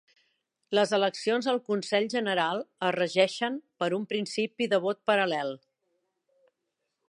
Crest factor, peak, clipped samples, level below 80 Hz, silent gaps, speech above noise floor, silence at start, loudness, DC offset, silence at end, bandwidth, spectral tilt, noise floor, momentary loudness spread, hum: 20 dB; -8 dBFS; under 0.1%; -84 dBFS; none; 55 dB; 0.7 s; -28 LUFS; under 0.1%; 1.5 s; 11.5 kHz; -4 dB/octave; -82 dBFS; 7 LU; none